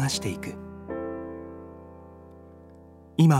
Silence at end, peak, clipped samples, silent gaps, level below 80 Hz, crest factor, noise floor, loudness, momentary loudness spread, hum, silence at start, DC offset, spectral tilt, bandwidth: 0 s; -8 dBFS; under 0.1%; none; -56 dBFS; 20 dB; -50 dBFS; -31 LUFS; 21 LU; none; 0 s; under 0.1%; -6 dB/octave; 14 kHz